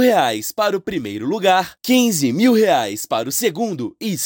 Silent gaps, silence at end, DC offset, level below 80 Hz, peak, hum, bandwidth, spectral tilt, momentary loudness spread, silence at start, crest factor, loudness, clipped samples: none; 0 s; under 0.1%; -58 dBFS; -4 dBFS; none; 17 kHz; -4 dB/octave; 9 LU; 0 s; 14 dB; -18 LUFS; under 0.1%